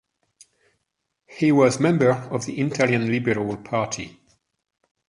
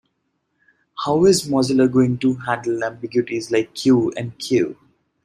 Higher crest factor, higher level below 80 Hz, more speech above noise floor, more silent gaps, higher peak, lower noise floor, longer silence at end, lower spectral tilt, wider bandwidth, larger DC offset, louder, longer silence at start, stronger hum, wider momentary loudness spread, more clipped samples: about the same, 20 dB vs 16 dB; about the same, -60 dBFS vs -58 dBFS; first, 57 dB vs 53 dB; neither; about the same, -4 dBFS vs -4 dBFS; first, -78 dBFS vs -71 dBFS; first, 1 s vs 0.5 s; about the same, -6 dB/octave vs -5.5 dB/octave; second, 11.5 kHz vs 13.5 kHz; neither; second, -22 LUFS vs -19 LUFS; first, 1.3 s vs 0.95 s; neither; about the same, 11 LU vs 9 LU; neither